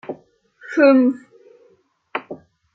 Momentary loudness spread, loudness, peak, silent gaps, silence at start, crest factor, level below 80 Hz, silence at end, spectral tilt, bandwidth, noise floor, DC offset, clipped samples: 25 LU; -17 LUFS; -2 dBFS; none; 0.1 s; 18 dB; -74 dBFS; 0.4 s; -6 dB/octave; 6.4 kHz; -58 dBFS; under 0.1%; under 0.1%